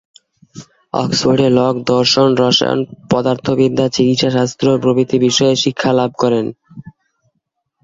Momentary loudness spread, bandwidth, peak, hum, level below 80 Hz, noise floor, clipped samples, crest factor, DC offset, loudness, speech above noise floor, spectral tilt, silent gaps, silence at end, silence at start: 6 LU; 7.8 kHz; 0 dBFS; none; -50 dBFS; -71 dBFS; under 0.1%; 14 dB; under 0.1%; -14 LUFS; 57 dB; -5 dB/octave; none; 0.95 s; 0.55 s